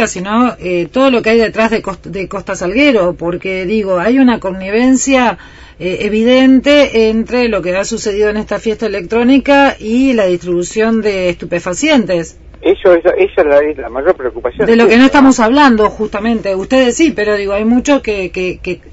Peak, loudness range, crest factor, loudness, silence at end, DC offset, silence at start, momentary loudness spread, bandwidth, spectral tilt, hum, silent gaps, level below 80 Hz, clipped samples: 0 dBFS; 3 LU; 12 dB; -11 LUFS; 0.05 s; under 0.1%; 0 s; 10 LU; 8 kHz; -4.5 dB/octave; none; none; -36 dBFS; 0.3%